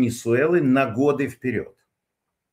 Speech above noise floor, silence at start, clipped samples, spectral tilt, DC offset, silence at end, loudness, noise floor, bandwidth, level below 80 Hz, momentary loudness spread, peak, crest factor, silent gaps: 60 dB; 0 s; under 0.1%; -6.5 dB/octave; under 0.1%; 0.9 s; -21 LUFS; -81 dBFS; 16 kHz; -62 dBFS; 10 LU; -6 dBFS; 16 dB; none